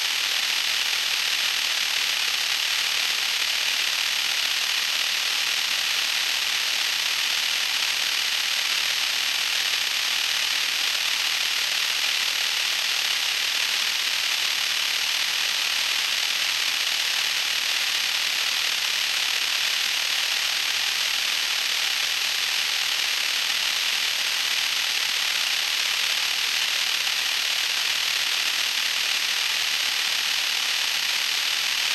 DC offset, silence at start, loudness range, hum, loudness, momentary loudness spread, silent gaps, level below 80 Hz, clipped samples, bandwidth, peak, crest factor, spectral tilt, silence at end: under 0.1%; 0 s; 0 LU; none; -21 LUFS; 0 LU; none; -70 dBFS; under 0.1%; 16 kHz; -10 dBFS; 14 dB; 3 dB/octave; 0 s